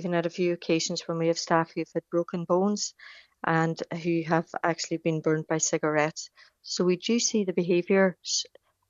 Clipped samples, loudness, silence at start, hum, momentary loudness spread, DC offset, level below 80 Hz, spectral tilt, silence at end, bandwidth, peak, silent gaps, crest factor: under 0.1%; -27 LUFS; 0 s; none; 7 LU; under 0.1%; -74 dBFS; -4 dB/octave; 0.45 s; 8 kHz; -8 dBFS; none; 20 dB